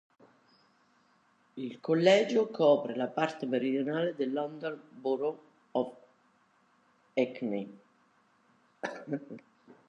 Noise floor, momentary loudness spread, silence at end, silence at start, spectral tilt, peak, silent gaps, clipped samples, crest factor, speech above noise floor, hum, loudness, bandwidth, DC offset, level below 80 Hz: -68 dBFS; 16 LU; 0.5 s; 1.55 s; -6 dB/octave; -10 dBFS; none; under 0.1%; 22 dB; 38 dB; none; -31 LUFS; 8.2 kHz; under 0.1%; -86 dBFS